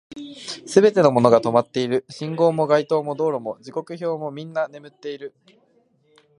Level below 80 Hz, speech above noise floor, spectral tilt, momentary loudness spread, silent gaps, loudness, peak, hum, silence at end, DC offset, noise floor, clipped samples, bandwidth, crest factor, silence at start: -66 dBFS; 41 dB; -6 dB/octave; 18 LU; none; -20 LUFS; 0 dBFS; none; 1.1 s; under 0.1%; -61 dBFS; under 0.1%; 11.5 kHz; 20 dB; 0.1 s